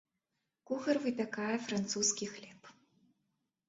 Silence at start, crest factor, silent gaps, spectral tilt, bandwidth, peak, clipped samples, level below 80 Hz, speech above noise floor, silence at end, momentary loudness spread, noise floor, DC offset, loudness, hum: 0.7 s; 20 dB; none; -3.5 dB/octave; 8 kHz; -18 dBFS; under 0.1%; -78 dBFS; 51 dB; 1 s; 12 LU; -86 dBFS; under 0.1%; -35 LUFS; none